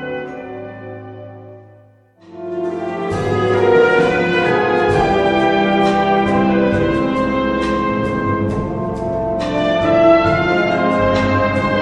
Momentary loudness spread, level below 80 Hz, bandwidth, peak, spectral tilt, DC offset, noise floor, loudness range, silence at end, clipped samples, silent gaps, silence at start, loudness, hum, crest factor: 17 LU; -38 dBFS; 10.5 kHz; -2 dBFS; -7 dB/octave; under 0.1%; -47 dBFS; 5 LU; 0 s; under 0.1%; none; 0 s; -15 LUFS; none; 14 dB